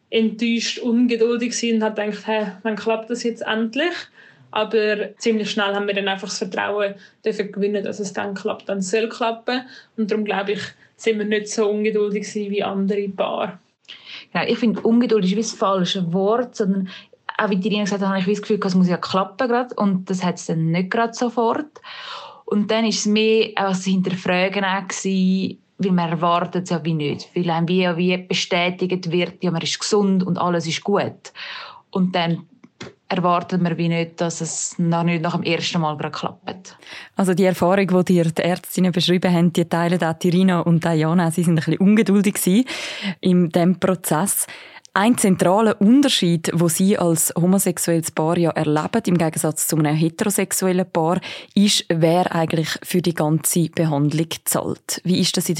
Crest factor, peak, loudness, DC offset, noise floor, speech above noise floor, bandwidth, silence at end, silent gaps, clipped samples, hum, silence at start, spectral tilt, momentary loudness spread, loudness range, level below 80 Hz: 20 dB; 0 dBFS; -20 LUFS; under 0.1%; -42 dBFS; 22 dB; 16.5 kHz; 0 s; none; under 0.1%; none; 0.1 s; -5 dB/octave; 9 LU; 5 LU; -66 dBFS